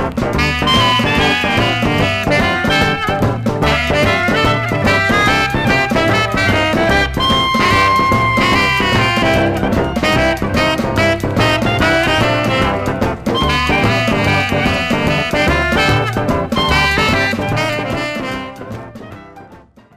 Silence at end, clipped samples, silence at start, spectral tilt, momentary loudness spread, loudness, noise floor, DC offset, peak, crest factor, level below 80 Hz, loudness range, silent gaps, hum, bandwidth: 0.4 s; under 0.1%; 0 s; -5 dB/octave; 5 LU; -13 LUFS; -42 dBFS; 0.2%; -2 dBFS; 12 dB; -28 dBFS; 2 LU; none; none; 16 kHz